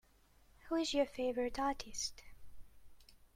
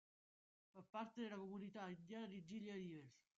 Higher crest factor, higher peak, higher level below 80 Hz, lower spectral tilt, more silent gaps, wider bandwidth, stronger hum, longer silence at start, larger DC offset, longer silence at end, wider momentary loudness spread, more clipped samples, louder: about the same, 20 dB vs 16 dB; first, -22 dBFS vs -38 dBFS; first, -60 dBFS vs under -90 dBFS; second, -2.5 dB/octave vs -5 dB/octave; second, none vs 0.89-0.93 s; first, 16 kHz vs 7.6 kHz; neither; about the same, 0.65 s vs 0.75 s; neither; about the same, 0.2 s vs 0.2 s; about the same, 6 LU vs 8 LU; neither; first, -38 LUFS vs -54 LUFS